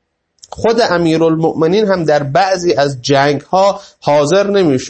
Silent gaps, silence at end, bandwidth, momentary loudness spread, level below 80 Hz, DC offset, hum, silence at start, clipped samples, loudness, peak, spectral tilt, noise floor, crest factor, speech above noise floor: none; 0 s; 8.8 kHz; 3 LU; -48 dBFS; under 0.1%; none; 0.55 s; under 0.1%; -13 LUFS; 0 dBFS; -5.5 dB/octave; -46 dBFS; 12 dB; 34 dB